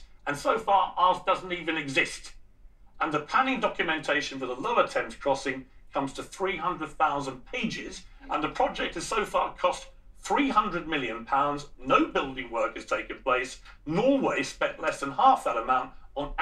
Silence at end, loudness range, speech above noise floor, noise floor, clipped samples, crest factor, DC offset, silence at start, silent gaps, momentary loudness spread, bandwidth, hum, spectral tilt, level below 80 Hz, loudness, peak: 0 s; 4 LU; 24 dB; -52 dBFS; under 0.1%; 20 dB; under 0.1%; 0 s; none; 11 LU; 13.5 kHz; none; -4 dB/octave; -50 dBFS; -28 LUFS; -8 dBFS